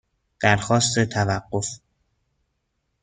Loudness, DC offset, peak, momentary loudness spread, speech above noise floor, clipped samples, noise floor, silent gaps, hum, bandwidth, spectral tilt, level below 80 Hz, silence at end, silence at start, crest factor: -22 LUFS; under 0.1%; -2 dBFS; 11 LU; 53 dB; under 0.1%; -74 dBFS; none; none; 9.6 kHz; -4 dB/octave; -54 dBFS; 1.25 s; 0.4 s; 22 dB